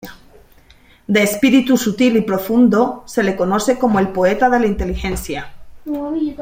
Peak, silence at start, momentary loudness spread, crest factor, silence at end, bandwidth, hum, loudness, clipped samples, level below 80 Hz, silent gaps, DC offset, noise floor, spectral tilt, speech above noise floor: -2 dBFS; 0.05 s; 11 LU; 16 dB; 0 s; 16.5 kHz; none; -16 LUFS; under 0.1%; -36 dBFS; none; under 0.1%; -48 dBFS; -5.5 dB/octave; 33 dB